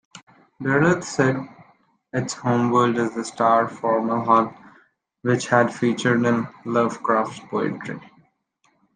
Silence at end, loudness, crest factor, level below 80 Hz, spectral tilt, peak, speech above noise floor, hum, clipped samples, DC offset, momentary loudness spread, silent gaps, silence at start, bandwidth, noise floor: 0.95 s; -21 LUFS; 20 dB; -64 dBFS; -6 dB/octave; -2 dBFS; 46 dB; none; under 0.1%; under 0.1%; 11 LU; 0.23-0.27 s; 0.15 s; 9.6 kHz; -66 dBFS